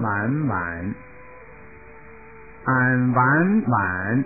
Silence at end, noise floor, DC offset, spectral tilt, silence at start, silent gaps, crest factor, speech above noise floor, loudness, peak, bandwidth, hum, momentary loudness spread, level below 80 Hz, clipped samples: 0 s; -44 dBFS; 0.4%; -14.5 dB/octave; 0 s; none; 16 dB; 24 dB; -21 LUFS; -6 dBFS; 2.7 kHz; none; 13 LU; -48 dBFS; under 0.1%